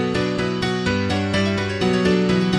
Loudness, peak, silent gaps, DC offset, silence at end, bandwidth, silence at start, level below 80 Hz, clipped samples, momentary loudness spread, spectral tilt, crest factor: -20 LUFS; -6 dBFS; none; under 0.1%; 0 s; 11 kHz; 0 s; -42 dBFS; under 0.1%; 4 LU; -6 dB/octave; 12 dB